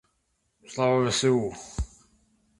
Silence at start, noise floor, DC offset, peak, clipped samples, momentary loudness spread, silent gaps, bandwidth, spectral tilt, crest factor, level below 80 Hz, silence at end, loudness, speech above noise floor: 0.7 s; -74 dBFS; under 0.1%; -10 dBFS; under 0.1%; 15 LU; none; 11.5 kHz; -4.5 dB/octave; 18 dB; -44 dBFS; 0.75 s; -26 LUFS; 49 dB